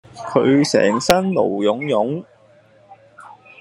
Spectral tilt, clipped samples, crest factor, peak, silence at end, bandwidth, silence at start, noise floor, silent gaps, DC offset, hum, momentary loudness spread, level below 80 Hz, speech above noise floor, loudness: -5 dB/octave; under 0.1%; 20 dB; 0 dBFS; 0.3 s; 12 kHz; 0.15 s; -51 dBFS; none; under 0.1%; none; 7 LU; -52 dBFS; 34 dB; -17 LUFS